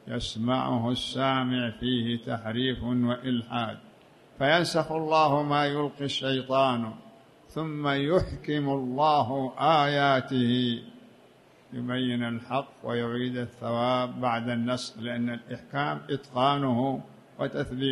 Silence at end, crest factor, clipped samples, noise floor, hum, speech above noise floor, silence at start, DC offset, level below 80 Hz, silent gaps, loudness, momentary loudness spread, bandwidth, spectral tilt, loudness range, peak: 0 s; 18 dB; under 0.1%; -57 dBFS; none; 29 dB; 0.05 s; under 0.1%; -54 dBFS; none; -28 LUFS; 10 LU; 12 kHz; -6 dB/octave; 4 LU; -10 dBFS